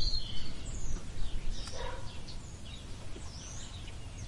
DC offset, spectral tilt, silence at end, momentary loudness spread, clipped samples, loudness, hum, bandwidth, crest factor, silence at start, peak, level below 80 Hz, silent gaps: under 0.1%; -3.5 dB/octave; 0 s; 6 LU; under 0.1%; -43 LUFS; none; 11.5 kHz; 14 dB; 0 s; -18 dBFS; -40 dBFS; none